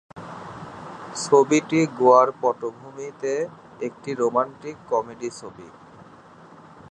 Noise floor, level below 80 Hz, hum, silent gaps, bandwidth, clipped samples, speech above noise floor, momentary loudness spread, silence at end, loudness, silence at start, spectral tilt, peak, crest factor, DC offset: -47 dBFS; -66 dBFS; none; none; 11 kHz; under 0.1%; 25 dB; 21 LU; 1.25 s; -22 LUFS; 0.15 s; -5 dB/octave; -2 dBFS; 22 dB; under 0.1%